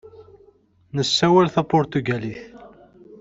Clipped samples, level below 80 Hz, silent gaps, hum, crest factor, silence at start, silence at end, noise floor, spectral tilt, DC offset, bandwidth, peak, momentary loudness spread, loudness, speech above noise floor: under 0.1%; -56 dBFS; none; none; 20 dB; 0.05 s; 0.05 s; -56 dBFS; -5.5 dB/octave; under 0.1%; 8 kHz; -2 dBFS; 15 LU; -20 LUFS; 37 dB